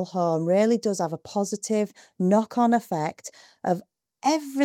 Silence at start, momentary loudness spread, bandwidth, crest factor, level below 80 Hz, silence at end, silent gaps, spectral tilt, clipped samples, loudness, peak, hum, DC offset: 0 s; 10 LU; 16 kHz; 16 dB; -74 dBFS; 0 s; none; -6 dB/octave; under 0.1%; -25 LUFS; -10 dBFS; none; under 0.1%